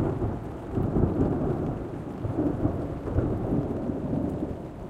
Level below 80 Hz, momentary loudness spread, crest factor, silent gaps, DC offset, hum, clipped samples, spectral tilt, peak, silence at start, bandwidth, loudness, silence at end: -38 dBFS; 8 LU; 20 dB; none; under 0.1%; none; under 0.1%; -10.5 dB/octave; -8 dBFS; 0 s; 10 kHz; -29 LUFS; 0 s